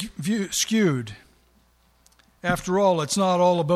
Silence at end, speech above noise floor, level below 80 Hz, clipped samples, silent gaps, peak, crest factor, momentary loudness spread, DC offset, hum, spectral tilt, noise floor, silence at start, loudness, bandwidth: 0 s; 39 dB; -54 dBFS; under 0.1%; none; -6 dBFS; 18 dB; 10 LU; under 0.1%; none; -4.5 dB/octave; -61 dBFS; 0 s; -23 LUFS; 14.5 kHz